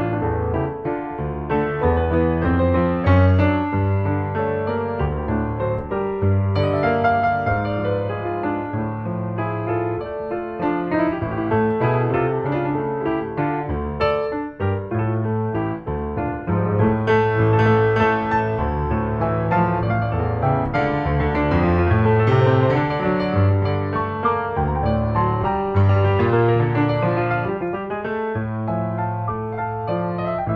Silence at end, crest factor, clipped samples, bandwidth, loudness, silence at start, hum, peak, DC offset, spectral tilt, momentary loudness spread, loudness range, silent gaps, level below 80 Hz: 0 s; 14 dB; under 0.1%; 5.6 kHz; -21 LUFS; 0 s; none; -6 dBFS; under 0.1%; -10 dB/octave; 8 LU; 5 LU; none; -36 dBFS